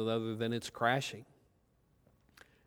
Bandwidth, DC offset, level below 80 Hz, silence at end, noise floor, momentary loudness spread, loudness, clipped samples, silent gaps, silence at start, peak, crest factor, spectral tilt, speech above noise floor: over 20 kHz; under 0.1%; -74 dBFS; 1.45 s; -72 dBFS; 10 LU; -35 LUFS; under 0.1%; none; 0 s; -16 dBFS; 22 dB; -5 dB/octave; 37 dB